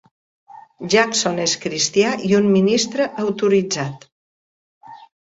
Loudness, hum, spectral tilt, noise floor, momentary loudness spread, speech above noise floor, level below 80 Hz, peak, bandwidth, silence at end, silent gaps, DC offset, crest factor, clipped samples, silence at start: -18 LUFS; none; -4 dB/octave; under -90 dBFS; 8 LU; over 72 dB; -60 dBFS; -2 dBFS; 8 kHz; 0.35 s; 4.12-4.81 s; under 0.1%; 18 dB; under 0.1%; 0.55 s